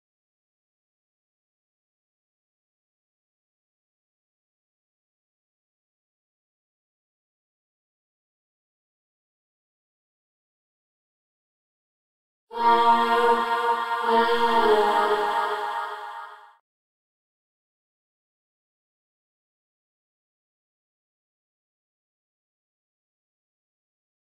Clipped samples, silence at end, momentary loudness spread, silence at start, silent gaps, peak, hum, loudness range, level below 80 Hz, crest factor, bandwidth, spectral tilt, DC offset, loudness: under 0.1%; 7.85 s; 15 LU; 12.5 s; none; -8 dBFS; none; 12 LU; -66 dBFS; 22 dB; 16 kHz; -3 dB/octave; under 0.1%; -22 LUFS